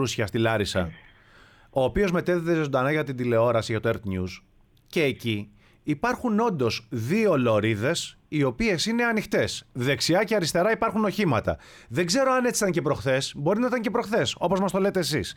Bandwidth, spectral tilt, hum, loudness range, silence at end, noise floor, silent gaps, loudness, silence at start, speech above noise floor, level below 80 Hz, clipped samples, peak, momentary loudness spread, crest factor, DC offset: 18.5 kHz; -5 dB/octave; none; 3 LU; 0.05 s; -54 dBFS; none; -25 LUFS; 0 s; 30 dB; -50 dBFS; under 0.1%; -10 dBFS; 8 LU; 14 dB; under 0.1%